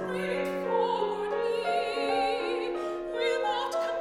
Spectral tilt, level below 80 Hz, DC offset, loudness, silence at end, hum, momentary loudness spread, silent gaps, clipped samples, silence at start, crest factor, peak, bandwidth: -4.5 dB/octave; -60 dBFS; under 0.1%; -29 LUFS; 0 s; none; 4 LU; none; under 0.1%; 0 s; 14 dB; -16 dBFS; 15.5 kHz